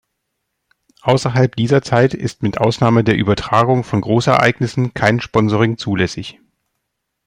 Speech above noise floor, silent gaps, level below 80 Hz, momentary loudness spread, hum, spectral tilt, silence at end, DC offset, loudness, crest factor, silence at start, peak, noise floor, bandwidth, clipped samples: 60 dB; none; -46 dBFS; 7 LU; none; -6.5 dB/octave; 0.95 s; under 0.1%; -16 LUFS; 16 dB; 1.05 s; 0 dBFS; -75 dBFS; 10.5 kHz; under 0.1%